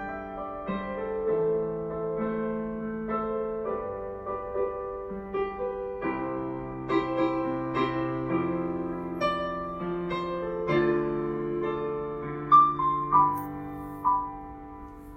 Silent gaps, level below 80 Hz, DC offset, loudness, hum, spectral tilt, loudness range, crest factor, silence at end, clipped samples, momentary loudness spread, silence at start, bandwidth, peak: none; -52 dBFS; under 0.1%; -29 LUFS; none; -8.5 dB/octave; 7 LU; 20 dB; 0 s; under 0.1%; 12 LU; 0 s; 16 kHz; -8 dBFS